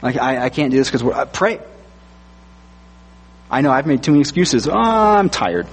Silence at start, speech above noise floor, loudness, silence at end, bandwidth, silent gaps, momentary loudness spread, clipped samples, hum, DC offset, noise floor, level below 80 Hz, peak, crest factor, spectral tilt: 0 s; 28 dB; -16 LUFS; 0 s; 8.8 kHz; none; 6 LU; under 0.1%; none; under 0.1%; -43 dBFS; -44 dBFS; -2 dBFS; 16 dB; -5 dB/octave